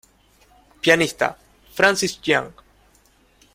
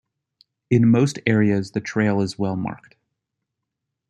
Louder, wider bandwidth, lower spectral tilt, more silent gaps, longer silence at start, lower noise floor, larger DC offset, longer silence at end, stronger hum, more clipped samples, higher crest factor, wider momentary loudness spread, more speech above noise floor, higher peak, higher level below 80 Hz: about the same, -19 LUFS vs -21 LUFS; first, 16.5 kHz vs 10 kHz; second, -3 dB/octave vs -7 dB/octave; neither; first, 0.85 s vs 0.7 s; second, -57 dBFS vs -81 dBFS; neither; second, 1.05 s vs 1.35 s; neither; neither; about the same, 22 dB vs 18 dB; about the same, 10 LU vs 11 LU; second, 38 dB vs 62 dB; about the same, -2 dBFS vs -4 dBFS; about the same, -56 dBFS vs -60 dBFS